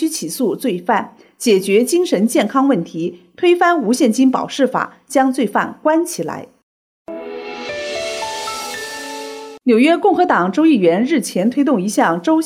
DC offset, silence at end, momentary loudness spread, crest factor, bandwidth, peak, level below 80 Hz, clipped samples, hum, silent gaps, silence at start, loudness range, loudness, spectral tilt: under 0.1%; 0 s; 13 LU; 14 dB; 16 kHz; -2 dBFS; -64 dBFS; under 0.1%; none; 6.63-7.05 s; 0 s; 8 LU; -16 LUFS; -4.5 dB/octave